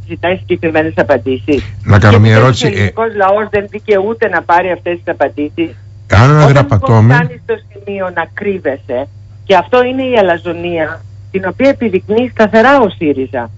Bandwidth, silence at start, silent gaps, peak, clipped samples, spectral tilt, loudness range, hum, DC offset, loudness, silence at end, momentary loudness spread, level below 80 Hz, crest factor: 8 kHz; 0 s; none; 0 dBFS; under 0.1%; -7 dB/octave; 4 LU; none; under 0.1%; -11 LUFS; 0 s; 12 LU; -36 dBFS; 10 dB